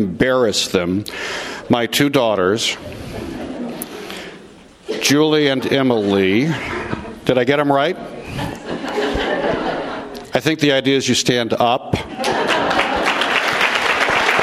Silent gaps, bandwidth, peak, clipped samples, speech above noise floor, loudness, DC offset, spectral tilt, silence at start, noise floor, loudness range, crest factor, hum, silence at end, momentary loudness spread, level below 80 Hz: none; 16 kHz; 0 dBFS; under 0.1%; 25 dB; -17 LUFS; under 0.1%; -4 dB/octave; 0 s; -42 dBFS; 4 LU; 18 dB; none; 0 s; 13 LU; -44 dBFS